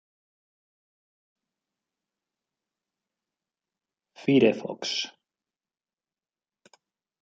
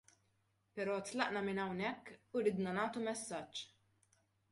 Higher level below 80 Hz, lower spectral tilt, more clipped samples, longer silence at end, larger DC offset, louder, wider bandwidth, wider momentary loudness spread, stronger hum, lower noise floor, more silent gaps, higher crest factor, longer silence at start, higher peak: about the same, -78 dBFS vs -80 dBFS; about the same, -5 dB/octave vs -4.5 dB/octave; neither; first, 2.1 s vs 0.85 s; neither; first, -25 LUFS vs -40 LUFS; second, 7.8 kHz vs 11.5 kHz; about the same, 12 LU vs 11 LU; neither; first, under -90 dBFS vs -79 dBFS; neither; about the same, 26 dB vs 22 dB; first, 4.2 s vs 0.75 s; first, -8 dBFS vs -20 dBFS